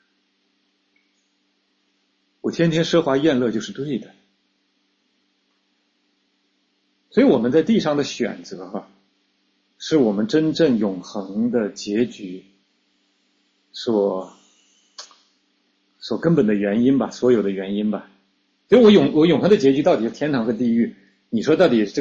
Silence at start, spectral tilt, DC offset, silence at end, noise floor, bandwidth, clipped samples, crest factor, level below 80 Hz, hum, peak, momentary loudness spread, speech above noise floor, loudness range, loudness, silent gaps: 2.45 s; -6.5 dB/octave; under 0.1%; 0 s; -68 dBFS; 7.6 kHz; under 0.1%; 18 dB; -60 dBFS; none; -4 dBFS; 17 LU; 49 dB; 11 LU; -19 LUFS; none